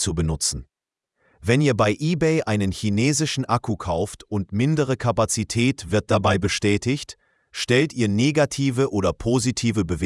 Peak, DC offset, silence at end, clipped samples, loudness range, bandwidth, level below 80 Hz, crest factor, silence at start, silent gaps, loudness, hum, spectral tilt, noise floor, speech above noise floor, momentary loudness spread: -2 dBFS; under 0.1%; 0 s; under 0.1%; 1 LU; 12 kHz; -44 dBFS; 18 dB; 0 s; none; -22 LUFS; none; -5 dB/octave; -79 dBFS; 58 dB; 7 LU